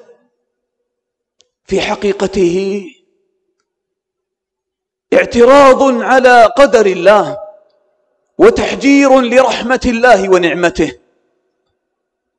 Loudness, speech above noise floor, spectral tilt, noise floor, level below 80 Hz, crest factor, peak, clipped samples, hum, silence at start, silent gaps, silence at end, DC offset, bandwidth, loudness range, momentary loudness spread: -9 LUFS; 70 dB; -4.5 dB/octave; -79 dBFS; -40 dBFS; 12 dB; 0 dBFS; under 0.1%; none; 1.7 s; none; 1.45 s; under 0.1%; 11.5 kHz; 10 LU; 12 LU